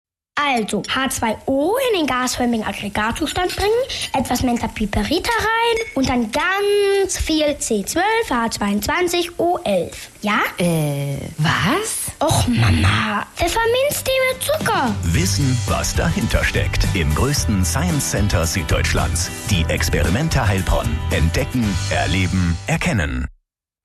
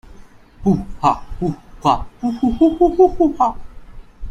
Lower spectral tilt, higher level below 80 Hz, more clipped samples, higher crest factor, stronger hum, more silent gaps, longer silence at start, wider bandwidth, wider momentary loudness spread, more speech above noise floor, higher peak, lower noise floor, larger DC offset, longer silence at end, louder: second, -4.5 dB/octave vs -8 dB/octave; about the same, -30 dBFS vs -34 dBFS; neither; about the same, 14 dB vs 18 dB; neither; neither; first, 0.35 s vs 0.1 s; first, 13 kHz vs 9 kHz; second, 4 LU vs 11 LU; first, 45 dB vs 25 dB; second, -4 dBFS vs 0 dBFS; first, -64 dBFS vs -41 dBFS; neither; first, 0.55 s vs 0 s; about the same, -19 LUFS vs -17 LUFS